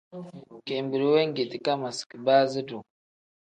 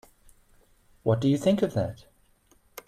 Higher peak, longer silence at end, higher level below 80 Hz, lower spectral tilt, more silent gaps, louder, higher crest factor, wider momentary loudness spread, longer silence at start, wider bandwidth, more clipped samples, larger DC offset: about the same, -8 dBFS vs -10 dBFS; first, 0.6 s vs 0.05 s; second, -76 dBFS vs -58 dBFS; second, -5 dB/octave vs -7.5 dB/octave; first, 2.06-2.10 s vs none; about the same, -26 LUFS vs -26 LUFS; about the same, 18 dB vs 18 dB; about the same, 20 LU vs 20 LU; second, 0.15 s vs 1.05 s; second, 9.6 kHz vs 14.5 kHz; neither; neither